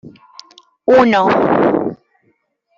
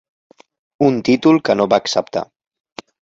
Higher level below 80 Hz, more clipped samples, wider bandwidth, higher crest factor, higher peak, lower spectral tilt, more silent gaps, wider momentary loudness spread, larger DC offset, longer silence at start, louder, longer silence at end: about the same, -54 dBFS vs -58 dBFS; neither; about the same, 7.4 kHz vs 7.8 kHz; about the same, 14 dB vs 16 dB; about the same, -2 dBFS vs -2 dBFS; first, -7 dB/octave vs -5.5 dB/octave; neither; second, 12 LU vs 24 LU; neither; second, 0.05 s vs 0.8 s; first, -13 LUFS vs -16 LUFS; about the same, 0.85 s vs 0.8 s